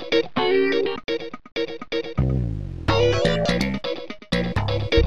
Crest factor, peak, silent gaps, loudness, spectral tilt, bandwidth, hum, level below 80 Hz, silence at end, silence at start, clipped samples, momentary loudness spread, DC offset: 16 dB; -6 dBFS; none; -23 LUFS; -6 dB/octave; 13 kHz; none; -34 dBFS; 0 s; 0 s; under 0.1%; 10 LU; 1%